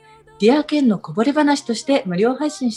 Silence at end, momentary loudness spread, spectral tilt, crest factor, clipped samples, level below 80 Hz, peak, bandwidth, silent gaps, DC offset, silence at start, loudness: 0 s; 4 LU; -5.5 dB/octave; 16 dB; under 0.1%; -62 dBFS; -2 dBFS; 11.5 kHz; none; under 0.1%; 0.4 s; -18 LUFS